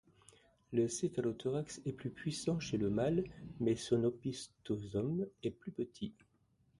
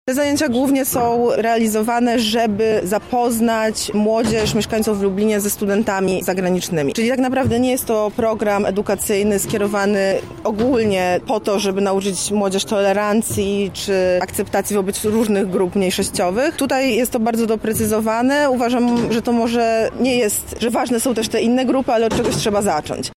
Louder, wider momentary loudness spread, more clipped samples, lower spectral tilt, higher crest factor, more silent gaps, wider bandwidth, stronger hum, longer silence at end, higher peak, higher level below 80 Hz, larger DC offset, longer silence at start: second, -38 LUFS vs -18 LUFS; first, 9 LU vs 3 LU; neither; first, -6 dB/octave vs -4.5 dB/octave; first, 18 dB vs 10 dB; neither; second, 11.5 kHz vs 16.5 kHz; neither; first, 0.7 s vs 0.05 s; second, -20 dBFS vs -8 dBFS; second, -64 dBFS vs -44 dBFS; second, under 0.1% vs 0.2%; first, 0.7 s vs 0.05 s